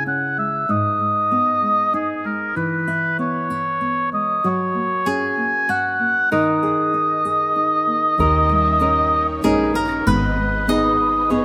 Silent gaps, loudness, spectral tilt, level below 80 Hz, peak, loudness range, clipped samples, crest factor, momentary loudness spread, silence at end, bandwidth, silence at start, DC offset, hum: none; -19 LUFS; -7 dB/octave; -32 dBFS; -2 dBFS; 4 LU; under 0.1%; 18 dB; 5 LU; 0 s; 16 kHz; 0 s; under 0.1%; none